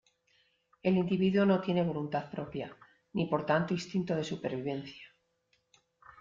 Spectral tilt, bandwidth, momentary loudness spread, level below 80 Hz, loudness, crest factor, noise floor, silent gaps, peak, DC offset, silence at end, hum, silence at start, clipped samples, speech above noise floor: -7 dB/octave; 7.6 kHz; 13 LU; -68 dBFS; -32 LUFS; 18 dB; -75 dBFS; none; -14 dBFS; under 0.1%; 1.15 s; none; 0.85 s; under 0.1%; 44 dB